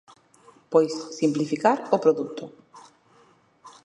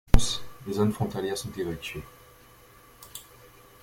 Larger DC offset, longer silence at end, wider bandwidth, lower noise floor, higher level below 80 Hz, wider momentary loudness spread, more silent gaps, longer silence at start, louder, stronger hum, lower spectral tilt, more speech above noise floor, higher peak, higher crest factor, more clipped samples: neither; second, 0.15 s vs 0.6 s; second, 10 kHz vs 16.5 kHz; first, -59 dBFS vs -54 dBFS; second, -78 dBFS vs -34 dBFS; second, 13 LU vs 25 LU; neither; first, 0.7 s vs 0.15 s; first, -24 LUFS vs -30 LUFS; neither; about the same, -6 dB/octave vs -5 dB/octave; first, 36 dB vs 24 dB; about the same, -4 dBFS vs -2 dBFS; about the same, 22 dB vs 24 dB; neither